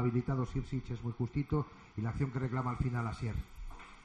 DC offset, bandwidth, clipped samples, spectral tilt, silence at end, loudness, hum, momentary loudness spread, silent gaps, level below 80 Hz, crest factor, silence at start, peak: under 0.1%; 9.4 kHz; under 0.1%; -8.5 dB/octave; 0 s; -37 LUFS; none; 9 LU; none; -48 dBFS; 16 dB; 0 s; -20 dBFS